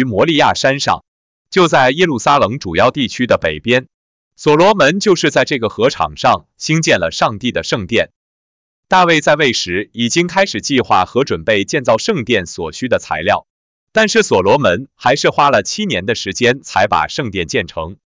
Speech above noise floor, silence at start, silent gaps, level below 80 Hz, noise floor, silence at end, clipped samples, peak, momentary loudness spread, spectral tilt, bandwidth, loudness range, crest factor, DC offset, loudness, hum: over 76 dB; 0 s; 1.08-1.45 s, 3.94-4.31 s, 8.16-8.83 s, 13.50-13.87 s; -42 dBFS; under -90 dBFS; 0.15 s; under 0.1%; -2 dBFS; 7 LU; -4 dB/octave; 7.8 kHz; 2 LU; 12 dB; under 0.1%; -14 LUFS; none